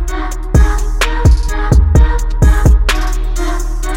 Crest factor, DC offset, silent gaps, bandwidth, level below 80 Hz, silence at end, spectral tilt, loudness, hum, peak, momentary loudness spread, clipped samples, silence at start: 10 dB; under 0.1%; none; 16 kHz; -12 dBFS; 0 s; -5.5 dB/octave; -14 LUFS; none; 0 dBFS; 9 LU; under 0.1%; 0 s